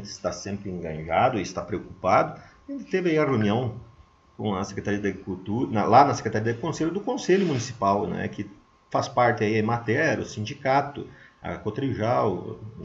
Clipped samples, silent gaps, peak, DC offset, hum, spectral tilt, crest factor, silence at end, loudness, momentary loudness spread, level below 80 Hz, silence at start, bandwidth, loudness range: under 0.1%; none; -4 dBFS; under 0.1%; none; -6 dB/octave; 22 dB; 0 s; -25 LUFS; 13 LU; -56 dBFS; 0 s; 8 kHz; 3 LU